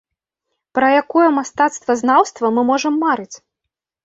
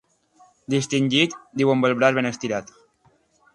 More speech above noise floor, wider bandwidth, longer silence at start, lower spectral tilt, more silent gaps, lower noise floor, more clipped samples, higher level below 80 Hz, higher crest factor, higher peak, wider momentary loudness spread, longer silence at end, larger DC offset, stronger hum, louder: first, 66 dB vs 41 dB; second, 8 kHz vs 11.5 kHz; about the same, 0.75 s vs 0.7 s; second, -3.5 dB/octave vs -5 dB/octave; neither; first, -81 dBFS vs -62 dBFS; neither; about the same, -64 dBFS vs -64 dBFS; second, 16 dB vs 22 dB; about the same, -2 dBFS vs -2 dBFS; second, 6 LU vs 9 LU; second, 0.7 s vs 0.9 s; neither; neither; first, -16 LUFS vs -21 LUFS